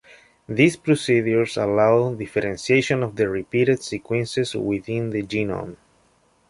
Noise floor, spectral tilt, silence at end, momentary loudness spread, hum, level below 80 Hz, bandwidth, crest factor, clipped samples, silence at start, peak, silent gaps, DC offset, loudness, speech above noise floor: -61 dBFS; -6 dB/octave; 0.75 s; 8 LU; none; -54 dBFS; 11.5 kHz; 18 dB; under 0.1%; 0.5 s; -2 dBFS; none; under 0.1%; -22 LUFS; 40 dB